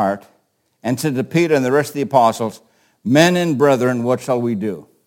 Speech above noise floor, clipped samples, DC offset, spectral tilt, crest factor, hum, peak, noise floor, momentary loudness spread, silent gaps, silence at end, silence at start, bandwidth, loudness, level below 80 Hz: 47 dB; under 0.1%; under 0.1%; -5.5 dB/octave; 18 dB; none; 0 dBFS; -63 dBFS; 12 LU; none; 0.25 s; 0 s; 17 kHz; -17 LUFS; -64 dBFS